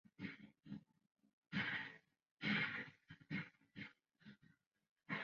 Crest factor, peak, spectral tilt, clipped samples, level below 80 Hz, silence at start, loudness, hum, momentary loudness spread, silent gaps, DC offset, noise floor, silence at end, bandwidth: 22 dB; -28 dBFS; -3 dB/octave; under 0.1%; -82 dBFS; 0.2 s; -46 LUFS; none; 24 LU; 1.33-1.42 s, 2.31-2.37 s, 4.67-4.71 s, 4.91-4.96 s; under 0.1%; -75 dBFS; 0 s; 7 kHz